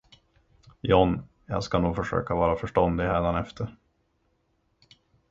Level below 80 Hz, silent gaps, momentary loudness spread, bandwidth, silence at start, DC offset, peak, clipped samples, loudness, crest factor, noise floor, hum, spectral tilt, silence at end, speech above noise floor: -42 dBFS; none; 13 LU; 7.8 kHz; 0.85 s; under 0.1%; -4 dBFS; under 0.1%; -26 LUFS; 22 dB; -71 dBFS; none; -7.5 dB/octave; 1.6 s; 46 dB